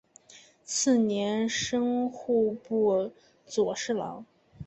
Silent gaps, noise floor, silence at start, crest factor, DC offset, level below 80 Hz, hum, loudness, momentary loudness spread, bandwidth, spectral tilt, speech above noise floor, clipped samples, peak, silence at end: none; -56 dBFS; 0.3 s; 16 dB; under 0.1%; -66 dBFS; none; -28 LUFS; 11 LU; 8.4 kHz; -4 dB/octave; 28 dB; under 0.1%; -14 dBFS; 0 s